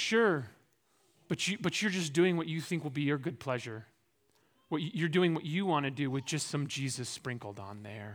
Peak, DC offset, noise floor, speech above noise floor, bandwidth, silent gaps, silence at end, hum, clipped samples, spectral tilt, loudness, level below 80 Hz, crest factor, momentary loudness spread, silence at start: -16 dBFS; under 0.1%; -73 dBFS; 40 dB; 18 kHz; none; 0 s; none; under 0.1%; -5 dB/octave; -33 LUFS; -78 dBFS; 18 dB; 14 LU; 0 s